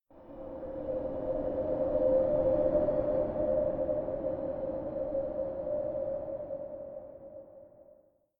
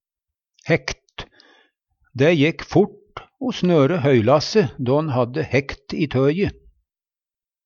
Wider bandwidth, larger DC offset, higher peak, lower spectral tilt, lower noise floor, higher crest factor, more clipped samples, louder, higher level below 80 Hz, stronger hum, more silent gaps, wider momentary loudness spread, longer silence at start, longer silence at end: second, 3.6 kHz vs 7.2 kHz; neither; second, -16 dBFS vs -4 dBFS; first, -11.5 dB/octave vs -6.5 dB/octave; second, -63 dBFS vs under -90 dBFS; about the same, 18 dB vs 18 dB; neither; second, -32 LUFS vs -20 LUFS; about the same, -52 dBFS vs -48 dBFS; neither; neither; about the same, 17 LU vs 19 LU; second, 0.1 s vs 0.65 s; second, 0.45 s vs 1.15 s